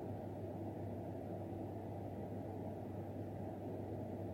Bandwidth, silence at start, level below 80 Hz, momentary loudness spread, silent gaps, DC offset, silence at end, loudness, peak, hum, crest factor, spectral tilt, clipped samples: 16.5 kHz; 0 s; -66 dBFS; 1 LU; none; under 0.1%; 0 s; -47 LUFS; -34 dBFS; none; 12 dB; -9.5 dB/octave; under 0.1%